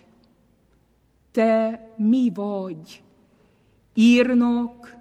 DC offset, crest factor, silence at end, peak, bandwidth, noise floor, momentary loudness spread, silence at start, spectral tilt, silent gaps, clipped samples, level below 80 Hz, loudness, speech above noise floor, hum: under 0.1%; 16 dB; 0.1 s; -6 dBFS; 9.2 kHz; -62 dBFS; 15 LU; 1.35 s; -6 dB/octave; none; under 0.1%; -62 dBFS; -21 LUFS; 42 dB; none